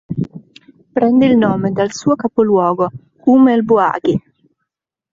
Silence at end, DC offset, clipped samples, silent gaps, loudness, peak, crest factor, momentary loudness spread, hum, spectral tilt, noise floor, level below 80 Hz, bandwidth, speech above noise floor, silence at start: 0.95 s; under 0.1%; under 0.1%; none; -14 LUFS; -2 dBFS; 12 dB; 12 LU; none; -7 dB/octave; -78 dBFS; -54 dBFS; 7.6 kHz; 65 dB; 0.1 s